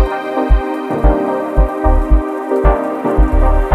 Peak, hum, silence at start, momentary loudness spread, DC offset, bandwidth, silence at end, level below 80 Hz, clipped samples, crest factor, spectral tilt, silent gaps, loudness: 0 dBFS; none; 0 s; 3 LU; under 0.1%; 4.5 kHz; 0 s; -14 dBFS; under 0.1%; 12 dB; -9 dB/octave; none; -15 LUFS